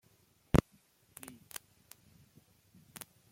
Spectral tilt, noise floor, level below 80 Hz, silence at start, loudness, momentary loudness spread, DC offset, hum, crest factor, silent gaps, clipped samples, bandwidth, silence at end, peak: -6.5 dB/octave; -69 dBFS; -48 dBFS; 0.55 s; -35 LUFS; 27 LU; under 0.1%; none; 30 dB; none; under 0.1%; 16.5 kHz; 2.75 s; -10 dBFS